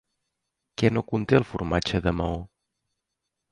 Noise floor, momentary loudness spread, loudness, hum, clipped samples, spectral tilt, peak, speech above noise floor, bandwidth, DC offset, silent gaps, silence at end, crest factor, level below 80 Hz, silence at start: -83 dBFS; 9 LU; -25 LUFS; none; under 0.1%; -6.5 dB/octave; -4 dBFS; 59 dB; 11 kHz; under 0.1%; none; 1.05 s; 22 dB; -42 dBFS; 0.8 s